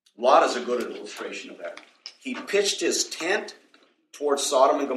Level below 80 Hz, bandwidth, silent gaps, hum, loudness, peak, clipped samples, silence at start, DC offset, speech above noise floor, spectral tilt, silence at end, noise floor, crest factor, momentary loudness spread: -78 dBFS; 14.5 kHz; none; none; -24 LUFS; -4 dBFS; under 0.1%; 0.2 s; under 0.1%; 36 dB; -1 dB/octave; 0 s; -60 dBFS; 22 dB; 19 LU